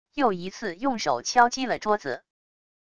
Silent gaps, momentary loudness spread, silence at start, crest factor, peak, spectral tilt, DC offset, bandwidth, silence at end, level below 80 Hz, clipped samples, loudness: none; 12 LU; 0.05 s; 22 dB; -6 dBFS; -3.5 dB/octave; 0.4%; 10 kHz; 0.65 s; -62 dBFS; under 0.1%; -25 LUFS